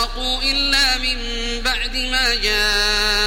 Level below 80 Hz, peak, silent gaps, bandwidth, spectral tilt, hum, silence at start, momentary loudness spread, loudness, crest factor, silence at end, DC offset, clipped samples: -28 dBFS; -4 dBFS; none; 16.5 kHz; -1 dB/octave; none; 0 s; 6 LU; -17 LUFS; 16 dB; 0 s; 0.1%; under 0.1%